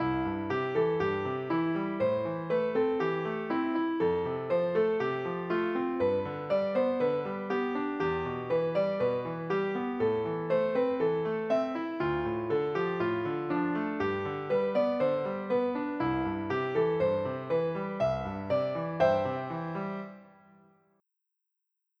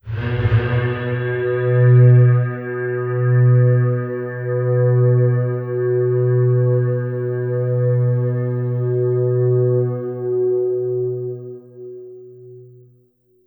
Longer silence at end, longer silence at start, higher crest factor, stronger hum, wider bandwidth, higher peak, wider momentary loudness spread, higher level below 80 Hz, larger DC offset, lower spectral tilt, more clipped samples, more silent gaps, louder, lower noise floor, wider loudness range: first, 1.7 s vs 0.8 s; about the same, 0 s vs 0.05 s; about the same, 16 dB vs 14 dB; neither; first, 6.4 kHz vs 3.6 kHz; second, -14 dBFS vs -2 dBFS; second, 5 LU vs 11 LU; second, -60 dBFS vs -46 dBFS; neither; second, -8.5 dB/octave vs -12.5 dB/octave; neither; neither; second, -30 LUFS vs -18 LUFS; first, -85 dBFS vs -57 dBFS; second, 1 LU vs 6 LU